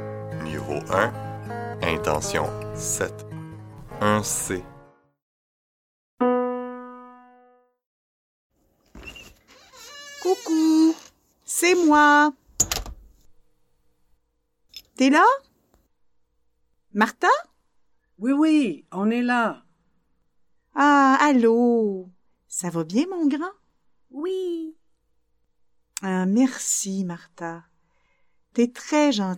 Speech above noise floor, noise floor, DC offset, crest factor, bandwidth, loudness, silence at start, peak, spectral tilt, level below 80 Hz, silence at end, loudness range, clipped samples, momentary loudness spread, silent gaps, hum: 49 dB; -70 dBFS; under 0.1%; 20 dB; 17 kHz; -22 LUFS; 0 s; -4 dBFS; -4 dB/octave; -52 dBFS; 0 s; 10 LU; under 0.1%; 22 LU; 5.22-6.17 s, 7.86-8.50 s; none